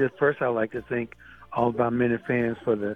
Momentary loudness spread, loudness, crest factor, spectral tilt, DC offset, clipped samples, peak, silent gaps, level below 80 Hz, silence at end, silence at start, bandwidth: 8 LU; -26 LUFS; 16 dB; -9 dB/octave; under 0.1%; under 0.1%; -8 dBFS; none; -58 dBFS; 0 s; 0 s; 4.4 kHz